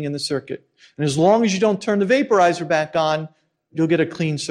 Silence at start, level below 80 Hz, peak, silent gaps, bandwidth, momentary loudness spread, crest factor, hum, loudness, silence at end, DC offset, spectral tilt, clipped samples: 0 s; -62 dBFS; -4 dBFS; none; 12.5 kHz; 12 LU; 16 dB; none; -19 LUFS; 0 s; under 0.1%; -5.5 dB/octave; under 0.1%